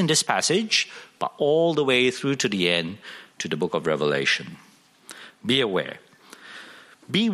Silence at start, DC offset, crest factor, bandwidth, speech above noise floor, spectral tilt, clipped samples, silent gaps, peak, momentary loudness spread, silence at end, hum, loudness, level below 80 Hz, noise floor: 0 s; under 0.1%; 20 dB; 14.5 kHz; 25 dB; -3.5 dB/octave; under 0.1%; none; -6 dBFS; 21 LU; 0 s; none; -23 LUFS; -68 dBFS; -48 dBFS